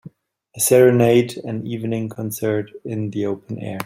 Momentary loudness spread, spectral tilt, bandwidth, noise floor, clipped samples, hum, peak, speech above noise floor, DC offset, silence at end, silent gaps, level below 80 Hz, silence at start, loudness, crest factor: 15 LU; -5.5 dB/octave; 16.5 kHz; -50 dBFS; under 0.1%; none; -2 dBFS; 31 dB; under 0.1%; 0 s; none; -58 dBFS; 0.05 s; -19 LUFS; 18 dB